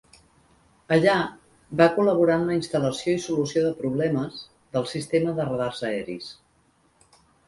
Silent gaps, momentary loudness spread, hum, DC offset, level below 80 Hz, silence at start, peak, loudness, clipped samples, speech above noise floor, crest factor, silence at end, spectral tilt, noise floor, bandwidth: none; 13 LU; none; under 0.1%; -60 dBFS; 0.9 s; -4 dBFS; -24 LUFS; under 0.1%; 40 dB; 22 dB; 1.15 s; -6 dB/octave; -63 dBFS; 11.5 kHz